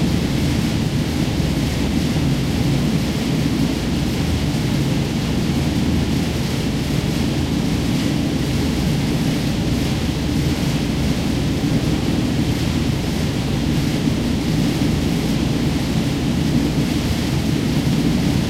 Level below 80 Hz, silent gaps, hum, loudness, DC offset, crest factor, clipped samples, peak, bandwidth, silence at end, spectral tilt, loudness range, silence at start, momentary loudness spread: -30 dBFS; none; none; -19 LUFS; under 0.1%; 14 dB; under 0.1%; -4 dBFS; 16 kHz; 0 s; -6 dB/octave; 1 LU; 0 s; 2 LU